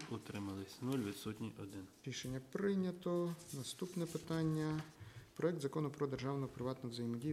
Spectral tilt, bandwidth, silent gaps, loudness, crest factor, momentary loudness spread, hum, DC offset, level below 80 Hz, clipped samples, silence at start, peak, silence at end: -6 dB/octave; 16 kHz; none; -42 LUFS; 18 dB; 9 LU; none; under 0.1%; -70 dBFS; under 0.1%; 0 s; -24 dBFS; 0 s